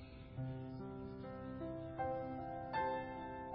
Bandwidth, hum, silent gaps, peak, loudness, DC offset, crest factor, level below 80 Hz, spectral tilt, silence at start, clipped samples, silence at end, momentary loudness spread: 5.6 kHz; none; none; -28 dBFS; -45 LUFS; under 0.1%; 16 dB; -62 dBFS; -6 dB/octave; 0 s; under 0.1%; 0 s; 8 LU